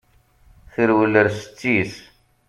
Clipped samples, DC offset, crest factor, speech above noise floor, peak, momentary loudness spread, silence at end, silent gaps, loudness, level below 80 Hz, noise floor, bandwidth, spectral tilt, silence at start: under 0.1%; under 0.1%; 20 dB; 36 dB; -2 dBFS; 15 LU; 0.5 s; none; -19 LUFS; -54 dBFS; -54 dBFS; 12 kHz; -6.5 dB/octave; 0.8 s